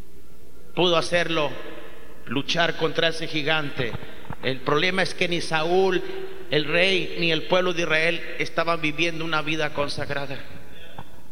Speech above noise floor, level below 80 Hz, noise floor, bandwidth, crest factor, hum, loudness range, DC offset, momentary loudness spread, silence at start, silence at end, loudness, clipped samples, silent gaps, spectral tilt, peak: 26 dB; -52 dBFS; -50 dBFS; 16.5 kHz; 20 dB; none; 3 LU; 4%; 17 LU; 0.15 s; 0.1 s; -23 LUFS; under 0.1%; none; -4.5 dB/octave; -4 dBFS